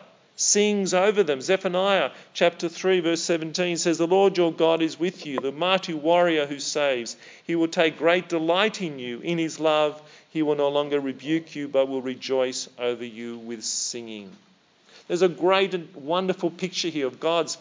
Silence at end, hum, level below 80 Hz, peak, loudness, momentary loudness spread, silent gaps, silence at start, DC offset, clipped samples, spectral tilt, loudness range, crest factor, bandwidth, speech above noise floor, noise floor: 0 s; none; -86 dBFS; -4 dBFS; -24 LUFS; 10 LU; none; 0.4 s; under 0.1%; under 0.1%; -3.5 dB/octave; 5 LU; 20 dB; 7.8 kHz; 32 dB; -56 dBFS